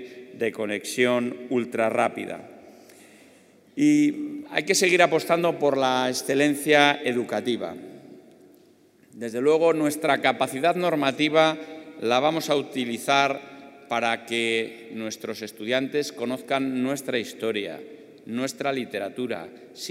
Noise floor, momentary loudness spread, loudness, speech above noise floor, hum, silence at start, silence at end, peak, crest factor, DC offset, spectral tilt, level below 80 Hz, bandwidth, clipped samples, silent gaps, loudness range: -57 dBFS; 15 LU; -24 LUFS; 33 dB; none; 0 s; 0 s; -2 dBFS; 24 dB; under 0.1%; -4 dB/octave; -78 dBFS; 16 kHz; under 0.1%; none; 7 LU